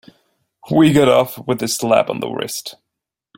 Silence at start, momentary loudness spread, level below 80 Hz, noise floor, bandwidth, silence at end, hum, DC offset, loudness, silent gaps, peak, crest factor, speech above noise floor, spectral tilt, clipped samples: 0.65 s; 13 LU; -54 dBFS; -81 dBFS; 17 kHz; 0.65 s; none; under 0.1%; -16 LUFS; none; 0 dBFS; 18 dB; 66 dB; -5 dB/octave; under 0.1%